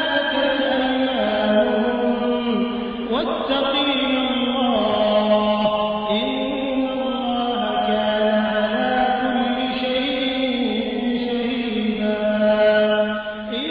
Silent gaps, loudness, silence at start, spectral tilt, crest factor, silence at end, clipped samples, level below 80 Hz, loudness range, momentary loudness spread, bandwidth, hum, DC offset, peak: none; -20 LUFS; 0 s; -8 dB/octave; 14 dB; 0 s; under 0.1%; -48 dBFS; 2 LU; 5 LU; 5.2 kHz; none; under 0.1%; -6 dBFS